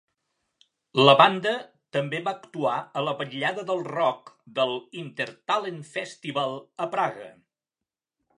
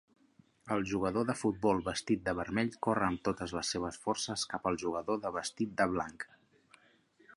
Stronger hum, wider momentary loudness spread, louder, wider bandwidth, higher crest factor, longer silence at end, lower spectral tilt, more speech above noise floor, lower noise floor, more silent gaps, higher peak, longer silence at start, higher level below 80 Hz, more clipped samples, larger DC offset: neither; first, 15 LU vs 5 LU; first, -25 LUFS vs -34 LUFS; about the same, 11 kHz vs 11.5 kHz; about the same, 24 dB vs 20 dB; about the same, 1.05 s vs 1.1 s; about the same, -5 dB/octave vs -4.5 dB/octave; first, 64 dB vs 33 dB; first, -89 dBFS vs -67 dBFS; neither; first, -2 dBFS vs -14 dBFS; first, 0.95 s vs 0.65 s; second, -80 dBFS vs -60 dBFS; neither; neither